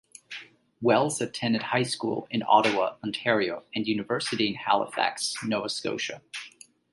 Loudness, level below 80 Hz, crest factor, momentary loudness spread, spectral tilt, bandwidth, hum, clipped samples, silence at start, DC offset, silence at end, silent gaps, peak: -27 LUFS; -70 dBFS; 22 dB; 16 LU; -4 dB/octave; 11.5 kHz; none; under 0.1%; 0.3 s; under 0.1%; 0.45 s; none; -6 dBFS